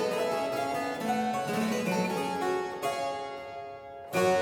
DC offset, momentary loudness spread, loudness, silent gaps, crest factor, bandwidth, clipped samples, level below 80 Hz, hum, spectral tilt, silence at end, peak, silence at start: under 0.1%; 11 LU; -31 LUFS; none; 16 dB; over 20 kHz; under 0.1%; -68 dBFS; none; -4.5 dB/octave; 0 s; -14 dBFS; 0 s